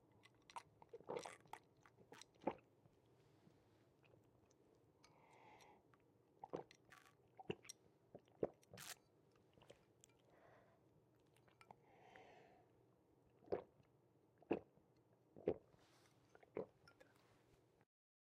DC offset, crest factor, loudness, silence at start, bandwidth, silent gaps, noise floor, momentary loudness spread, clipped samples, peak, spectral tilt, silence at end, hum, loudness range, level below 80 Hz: under 0.1%; 30 dB; -53 LUFS; 0.05 s; 12 kHz; none; -76 dBFS; 20 LU; under 0.1%; -26 dBFS; -5 dB/octave; 0.7 s; none; 10 LU; -86 dBFS